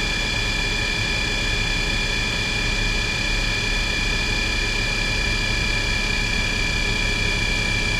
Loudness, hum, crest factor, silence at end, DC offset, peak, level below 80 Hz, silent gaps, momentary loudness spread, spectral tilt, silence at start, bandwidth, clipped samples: -21 LUFS; none; 12 dB; 0 s; under 0.1%; -10 dBFS; -28 dBFS; none; 1 LU; -3 dB/octave; 0 s; 15.5 kHz; under 0.1%